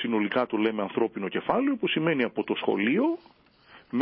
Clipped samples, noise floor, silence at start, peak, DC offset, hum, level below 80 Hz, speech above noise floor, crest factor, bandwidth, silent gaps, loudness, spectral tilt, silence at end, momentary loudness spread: under 0.1%; -55 dBFS; 0 s; -10 dBFS; under 0.1%; none; -70 dBFS; 29 dB; 16 dB; 5.4 kHz; none; -27 LUFS; -10 dB/octave; 0 s; 4 LU